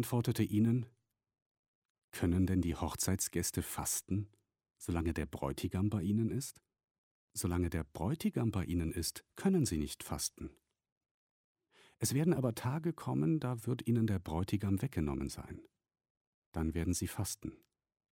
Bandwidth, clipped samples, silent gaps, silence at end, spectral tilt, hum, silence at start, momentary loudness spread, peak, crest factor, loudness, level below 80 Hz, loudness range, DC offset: 16.5 kHz; under 0.1%; 1.42-1.95 s, 2.04-2.08 s, 6.91-7.28 s, 10.92-11.01 s, 11.11-11.55 s, 16.10-16.52 s; 0.55 s; -5.5 dB/octave; none; 0 s; 11 LU; -20 dBFS; 18 dB; -36 LUFS; -54 dBFS; 3 LU; under 0.1%